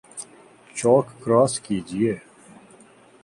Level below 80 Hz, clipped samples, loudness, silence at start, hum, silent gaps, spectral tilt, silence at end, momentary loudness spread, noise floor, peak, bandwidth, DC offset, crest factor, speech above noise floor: -60 dBFS; under 0.1%; -22 LUFS; 0.15 s; none; none; -5.5 dB/octave; 1.05 s; 19 LU; -51 dBFS; -4 dBFS; 11.5 kHz; under 0.1%; 20 dB; 31 dB